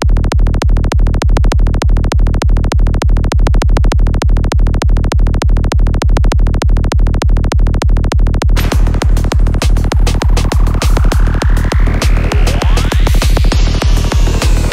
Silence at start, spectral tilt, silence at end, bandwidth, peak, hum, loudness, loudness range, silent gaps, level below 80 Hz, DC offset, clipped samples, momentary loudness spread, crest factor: 0 s; -6 dB/octave; 0 s; 14 kHz; 0 dBFS; none; -13 LUFS; 0 LU; none; -10 dBFS; under 0.1%; under 0.1%; 1 LU; 8 dB